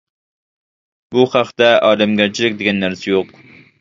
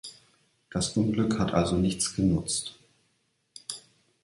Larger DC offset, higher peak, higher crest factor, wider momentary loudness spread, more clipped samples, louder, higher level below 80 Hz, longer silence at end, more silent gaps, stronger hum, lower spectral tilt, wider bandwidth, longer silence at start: neither; first, 0 dBFS vs -8 dBFS; second, 16 dB vs 22 dB; second, 8 LU vs 16 LU; neither; first, -15 LUFS vs -27 LUFS; second, -56 dBFS vs -48 dBFS; about the same, 0.55 s vs 0.45 s; neither; neither; about the same, -5 dB/octave vs -5 dB/octave; second, 7.8 kHz vs 11.5 kHz; first, 1.1 s vs 0.05 s